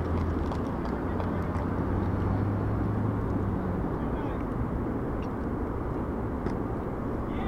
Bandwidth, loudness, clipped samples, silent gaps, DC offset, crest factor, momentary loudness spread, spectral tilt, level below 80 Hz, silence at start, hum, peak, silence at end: 8 kHz; -31 LUFS; under 0.1%; none; under 0.1%; 14 dB; 4 LU; -9.5 dB/octave; -38 dBFS; 0 s; none; -16 dBFS; 0 s